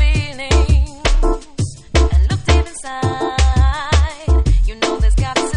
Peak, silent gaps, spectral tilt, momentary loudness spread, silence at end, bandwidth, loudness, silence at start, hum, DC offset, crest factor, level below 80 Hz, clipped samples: -2 dBFS; none; -5 dB/octave; 7 LU; 0 s; 10.5 kHz; -17 LUFS; 0 s; none; under 0.1%; 12 dB; -16 dBFS; under 0.1%